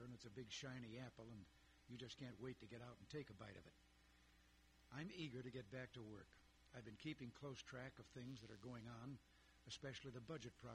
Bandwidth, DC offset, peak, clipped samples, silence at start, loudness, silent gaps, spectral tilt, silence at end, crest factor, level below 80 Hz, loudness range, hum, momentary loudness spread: 13 kHz; under 0.1%; -40 dBFS; under 0.1%; 0 s; -57 LUFS; none; -5 dB/octave; 0 s; 18 dB; -76 dBFS; 3 LU; none; 9 LU